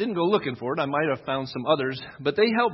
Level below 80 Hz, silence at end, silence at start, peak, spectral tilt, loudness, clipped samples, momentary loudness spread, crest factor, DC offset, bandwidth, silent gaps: -66 dBFS; 0 s; 0 s; -8 dBFS; -8 dB/octave; -25 LUFS; under 0.1%; 7 LU; 18 dB; under 0.1%; 6 kHz; none